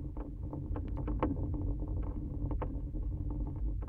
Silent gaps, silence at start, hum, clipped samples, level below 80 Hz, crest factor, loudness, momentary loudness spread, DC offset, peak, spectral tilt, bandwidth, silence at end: none; 0 s; none; under 0.1%; -38 dBFS; 18 dB; -39 LUFS; 6 LU; under 0.1%; -18 dBFS; -11.5 dB/octave; 3.2 kHz; 0 s